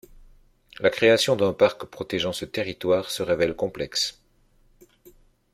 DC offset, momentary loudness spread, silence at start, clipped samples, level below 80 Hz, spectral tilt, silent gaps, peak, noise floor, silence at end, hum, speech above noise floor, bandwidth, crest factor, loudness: under 0.1%; 10 LU; 0.8 s; under 0.1%; -56 dBFS; -4 dB/octave; none; -4 dBFS; -61 dBFS; 1.4 s; none; 37 dB; 15.5 kHz; 22 dB; -23 LUFS